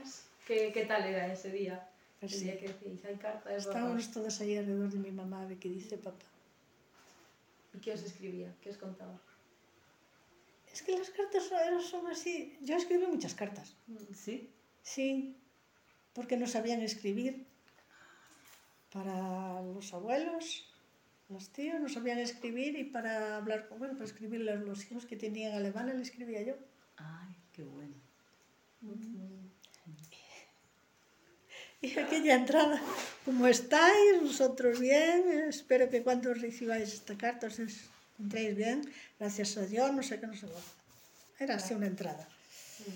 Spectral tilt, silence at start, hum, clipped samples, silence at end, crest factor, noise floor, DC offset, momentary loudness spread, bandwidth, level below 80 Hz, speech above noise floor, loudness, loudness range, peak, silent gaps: -4 dB/octave; 0 s; none; under 0.1%; 0 s; 24 dB; -69 dBFS; under 0.1%; 22 LU; 17 kHz; -86 dBFS; 35 dB; -34 LUFS; 21 LU; -12 dBFS; none